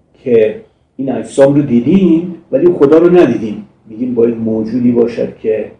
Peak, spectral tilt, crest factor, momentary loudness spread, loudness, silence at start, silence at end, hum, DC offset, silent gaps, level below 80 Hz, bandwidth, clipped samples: 0 dBFS; -8.5 dB/octave; 12 dB; 12 LU; -11 LUFS; 0.25 s; 0.1 s; none; under 0.1%; none; -46 dBFS; 9.8 kHz; 1%